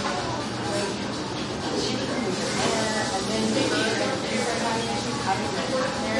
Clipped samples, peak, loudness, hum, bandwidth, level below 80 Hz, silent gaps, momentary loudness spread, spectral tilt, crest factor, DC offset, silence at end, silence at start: under 0.1%; -10 dBFS; -26 LUFS; none; 11.5 kHz; -52 dBFS; none; 5 LU; -3.5 dB/octave; 16 dB; under 0.1%; 0 s; 0 s